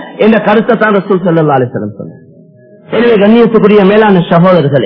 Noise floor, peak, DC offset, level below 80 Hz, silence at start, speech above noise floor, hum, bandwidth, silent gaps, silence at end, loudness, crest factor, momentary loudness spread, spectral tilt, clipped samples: -38 dBFS; 0 dBFS; under 0.1%; -46 dBFS; 0 s; 31 dB; none; 5.4 kHz; none; 0 s; -7 LUFS; 8 dB; 11 LU; -10 dB/octave; 3%